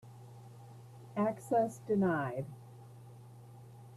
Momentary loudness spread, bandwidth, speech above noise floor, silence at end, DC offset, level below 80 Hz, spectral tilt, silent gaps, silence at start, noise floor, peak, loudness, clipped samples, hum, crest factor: 22 LU; 14 kHz; 20 dB; 0 s; under 0.1%; -74 dBFS; -8 dB/octave; none; 0.05 s; -53 dBFS; -20 dBFS; -34 LUFS; under 0.1%; none; 18 dB